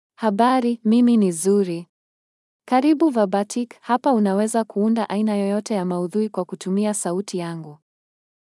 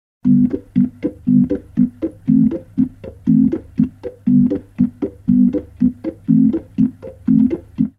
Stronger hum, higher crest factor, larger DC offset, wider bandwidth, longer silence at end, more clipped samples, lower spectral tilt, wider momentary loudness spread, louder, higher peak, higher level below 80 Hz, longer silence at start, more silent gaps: neither; about the same, 16 dB vs 14 dB; neither; first, 12 kHz vs 3.3 kHz; first, 0.75 s vs 0.1 s; neither; second, -6 dB/octave vs -11.5 dB/octave; about the same, 9 LU vs 7 LU; second, -20 LUFS vs -17 LUFS; about the same, -4 dBFS vs -2 dBFS; second, -86 dBFS vs -44 dBFS; about the same, 0.2 s vs 0.25 s; first, 1.89-2.60 s vs none